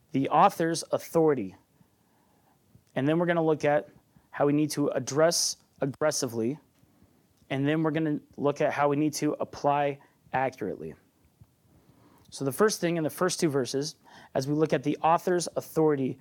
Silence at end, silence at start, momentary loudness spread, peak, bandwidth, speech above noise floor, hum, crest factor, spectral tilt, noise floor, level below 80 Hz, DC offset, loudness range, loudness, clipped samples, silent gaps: 0.05 s; 0.15 s; 10 LU; -10 dBFS; 19 kHz; 39 dB; none; 18 dB; -5 dB/octave; -66 dBFS; -70 dBFS; under 0.1%; 4 LU; -27 LUFS; under 0.1%; none